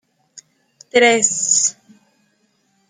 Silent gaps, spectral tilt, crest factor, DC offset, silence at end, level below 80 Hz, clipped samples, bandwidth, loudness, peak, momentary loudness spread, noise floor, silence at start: none; -0.5 dB/octave; 18 dB; under 0.1%; 1.2 s; -70 dBFS; under 0.1%; 9.8 kHz; -14 LUFS; -2 dBFS; 7 LU; -63 dBFS; 0.35 s